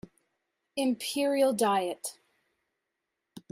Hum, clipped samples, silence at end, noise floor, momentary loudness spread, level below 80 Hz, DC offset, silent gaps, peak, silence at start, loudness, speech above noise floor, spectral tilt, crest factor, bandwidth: none; under 0.1%; 0.15 s; -84 dBFS; 14 LU; -76 dBFS; under 0.1%; none; -14 dBFS; 0.75 s; -29 LUFS; 56 dB; -3.5 dB/octave; 18 dB; 16 kHz